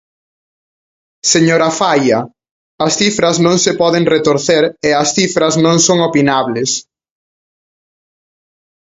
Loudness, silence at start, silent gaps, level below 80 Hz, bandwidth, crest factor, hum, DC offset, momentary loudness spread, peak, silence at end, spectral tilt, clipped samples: -12 LUFS; 1.25 s; 2.51-2.78 s; -52 dBFS; 8 kHz; 14 dB; none; under 0.1%; 7 LU; 0 dBFS; 2.2 s; -3.5 dB/octave; under 0.1%